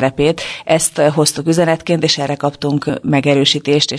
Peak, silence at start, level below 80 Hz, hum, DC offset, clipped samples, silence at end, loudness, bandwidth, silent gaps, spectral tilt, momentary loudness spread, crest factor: 0 dBFS; 0 s; -48 dBFS; none; under 0.1%; under 0.1%; 0 s; -14 LUFS; 11 kHz; none; -4 dB/octave; 6 LU; 14 dB